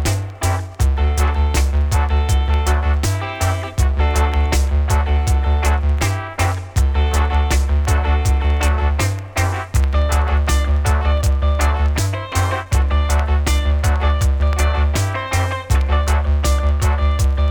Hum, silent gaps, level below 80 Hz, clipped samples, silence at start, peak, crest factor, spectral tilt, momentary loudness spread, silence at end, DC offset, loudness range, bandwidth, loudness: none; none; -18 dBFS; under 0.1%; 0 s; -2 dBFS; 12 dB; -5 dB/octave; 3 LU; 0 s; under 0.1%; 0 LU; 19 kHz; -18 LUFS